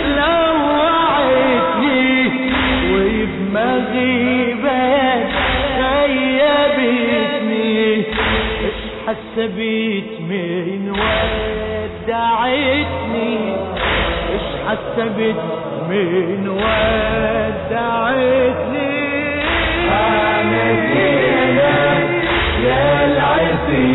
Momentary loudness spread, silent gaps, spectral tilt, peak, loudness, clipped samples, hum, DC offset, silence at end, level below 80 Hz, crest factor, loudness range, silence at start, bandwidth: 7 LU; none; -9 dB/octave; -6 dBFS; -16 LUFS; under 0.1%; none; under 0.1%; 0 s; -32 dBFS; 10 dB; 5 LU; 0 s; 4.1 kHz